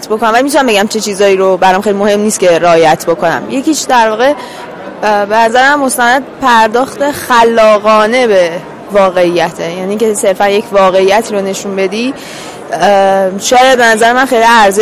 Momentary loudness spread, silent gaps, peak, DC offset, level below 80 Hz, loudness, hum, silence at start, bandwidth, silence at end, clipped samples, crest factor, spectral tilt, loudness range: 9 LU; none; 0 dBFS; 0.5%; -46 dBFS; -9 LUFS; none; 0 s; 16 kHz; 0 s; 0.2%; 8 dB; -3.5 dB/octave; 3 LU